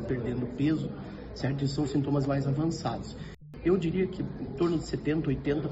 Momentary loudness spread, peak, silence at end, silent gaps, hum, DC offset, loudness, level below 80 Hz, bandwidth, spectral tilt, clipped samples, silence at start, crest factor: 10 LU; -14 dBFS; 0 s; none; none; under 0.1%; -30 LUFS; -48 dBFS; 8 kHz; -7.5 dB/octave; under 0.1%; 0 s; 16 dB